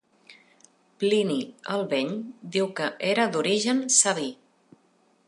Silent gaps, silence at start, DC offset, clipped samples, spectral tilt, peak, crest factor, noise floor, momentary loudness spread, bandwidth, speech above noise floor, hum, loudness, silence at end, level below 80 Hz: none; 0.3 s; under 0.1%; under 0.1%; -2.5 dB/octave; -6 dBFS; 22 dB; -64 dBFS; 12 LU; 11.5 kHz; 39 dB; none; -25 LUFS; 0.95 s; -80 dBFS